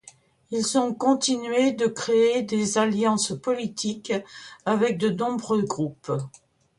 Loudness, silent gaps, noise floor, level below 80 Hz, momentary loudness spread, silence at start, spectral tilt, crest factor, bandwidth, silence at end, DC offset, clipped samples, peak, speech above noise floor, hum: -24 LUFS; none; -53 dBFS; -66 dBFS; 9 LU; 0.05 s; -4.5 dB/octave; 18 dB; 11.5 kHz; 0.5 s; under 0.1%; under 0.1%; -8 dBFS; 29 dB; none